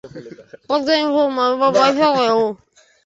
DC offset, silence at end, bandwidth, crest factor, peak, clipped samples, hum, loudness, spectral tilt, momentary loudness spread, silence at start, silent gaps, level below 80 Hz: under 0.1%; 0.5 s; 8 kHz; 16 dB; -2 dBFS; under 0.1%; none; -16 LUFS; -4.5 dB/octave; 18 LU; 0.05 s; none; -62 dBFS